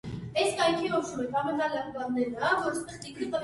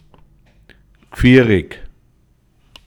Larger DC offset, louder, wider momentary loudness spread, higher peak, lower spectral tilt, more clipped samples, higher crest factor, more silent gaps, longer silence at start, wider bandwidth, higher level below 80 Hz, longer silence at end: neither; second, -29 LUFS vs -13 LUFS; second, 8 LU vs 27 LU; second, -12 dBFS vs 0 dBFS; second, -4 dB/octave vs -7.5 dB/octave; neither; about the same, 18 dB vs 18 dB; neither; second, 0.05 s vs 1.15 s; second, 11.5 kHz vs 16.5 kHz; second, -60 dBFS vs -34 dBFS; second, 0 s vs 1 s